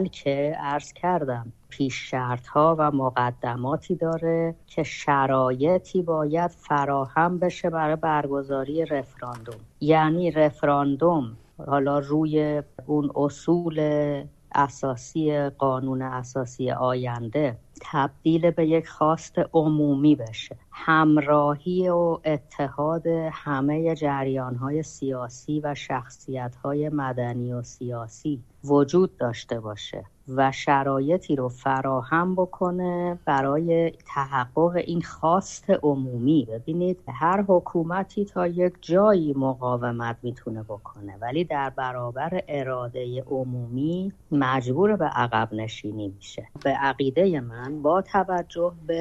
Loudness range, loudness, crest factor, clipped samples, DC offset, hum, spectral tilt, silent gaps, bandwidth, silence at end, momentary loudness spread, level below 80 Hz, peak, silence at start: 5 LU; -25 LUFS; 18 dB; under 0.1%; under 0.1%; none; -7 dB/octave; none; 8.4 kHz; 0 s; 11 LU; -56 dBFS; -6 dBFS; 0 s